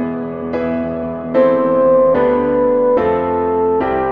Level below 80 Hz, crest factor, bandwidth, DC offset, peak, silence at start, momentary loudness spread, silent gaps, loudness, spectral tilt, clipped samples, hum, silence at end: -42 dBFS; 14 dB; 4.7 kHz; 0.4%; -2 dBFS; 0 s; 10 LU; none; -15 LUFS; -9.5 dB/octave; under 0.1%; none; 0 s